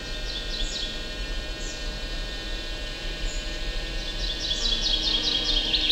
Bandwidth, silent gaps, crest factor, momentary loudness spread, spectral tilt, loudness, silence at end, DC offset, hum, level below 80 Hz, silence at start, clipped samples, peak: 14.5 kHz; none; 18 dB; 11 LU; -2 dB/octave; -27 LUFS; 0 s; under 0.1%; none; -32 dBFS; 0 s; under 0.1%; -10 dBFS